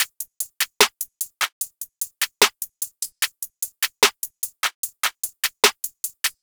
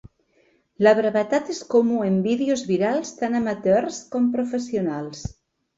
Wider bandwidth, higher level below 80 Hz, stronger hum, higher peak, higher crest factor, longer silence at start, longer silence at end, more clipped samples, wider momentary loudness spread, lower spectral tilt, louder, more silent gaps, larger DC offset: first, over 20 kHz vs 8 kHz; second, -66 dBFS vs -54 dBFS; neither; first, 0 dBFS vs -4 dBFS; first, 24 dB vs 18 dB; second, 0 s vs 0.8 s; second, 0.1 s vs 0.45 s; neither; about the same, 11 LU vs 9 LU; second, 1.5 dB/octave vs -6 dB/octave; about the same, -22 LUFS vs -22 LUFS; first, 1.52-1.61 s, 4.75-4.83 s vs none; neither